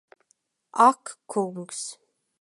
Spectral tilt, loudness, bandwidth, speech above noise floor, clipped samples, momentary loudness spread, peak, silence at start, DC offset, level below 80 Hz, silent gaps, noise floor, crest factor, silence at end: -4 dB/octave; -25 LUFS; 11.5 kHz; 46 dB; under 0.1%; 16 LU; -6 dBFS; 0.75 s; under 0.1%; -86 dBFS; none; -70 dBFS; 22 dB; 0.45 s